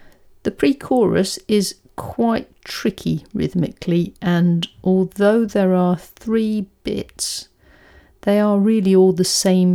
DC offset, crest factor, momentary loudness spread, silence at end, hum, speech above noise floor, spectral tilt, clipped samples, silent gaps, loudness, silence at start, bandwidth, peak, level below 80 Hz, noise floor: under 0.1%; 16 dB; 11 LU; 0 s; none; 32 dB; -5.5 dB/octave; under 0.1%; none; -19 LUFS; 0.45 s; 16 kHz; -2 dBFS; -48 dBFS; -49 dBFS